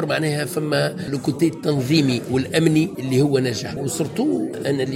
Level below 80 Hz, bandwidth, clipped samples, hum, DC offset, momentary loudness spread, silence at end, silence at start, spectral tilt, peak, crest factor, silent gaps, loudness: -54 dBFS; 16.5 kHz; under 0.1%; none; under 0.1%; 6 LU; 0 s; 0 s; -5.5 dB/octave; -4 dBFS; 16 dB; none; -21 LUFS